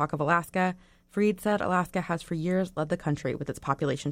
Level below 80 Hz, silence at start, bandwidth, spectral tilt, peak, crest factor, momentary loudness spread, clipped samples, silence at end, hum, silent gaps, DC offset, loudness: -56 dBFS; 0 s; 16.5 kHz; -6.5 dB/octave; -10 dBFS; 18 dB; 6 LU; under 0.1%; 0 s; none; none; under 0.1%; -29 LUFS